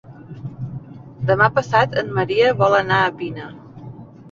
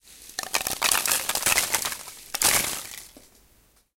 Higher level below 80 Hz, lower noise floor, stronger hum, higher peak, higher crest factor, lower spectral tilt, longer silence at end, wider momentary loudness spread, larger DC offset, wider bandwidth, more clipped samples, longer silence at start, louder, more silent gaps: about the same, -52 dBFS vs -54 dBFS; second, -38 dBFS vs -61 dBFS; neither; about the same, -2 dBFS vs 0 dBFS; second, 18 dB vs 26 dB; first, -6.5 dB/octave vs 0.5 dB/octave; second, 0 s vs 0.9 s; first, 22 LU vs 16 LU; neither; second, 7.6 kHz vs 17 kHz; neither; about the same, 0.1 s vs 0.05 s; first, -18 LUFS vs -23 LUFS; neither